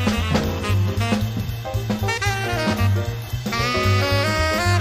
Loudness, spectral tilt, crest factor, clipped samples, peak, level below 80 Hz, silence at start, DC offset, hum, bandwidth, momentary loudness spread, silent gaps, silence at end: -21 LUFS; -5.5 dB/octave; 16 dB; under 0.1%; -6 dBFS; -34 dBFS; 0 s; under 0.1%; none; 15.5 kHz; 7 LU; none; 0 s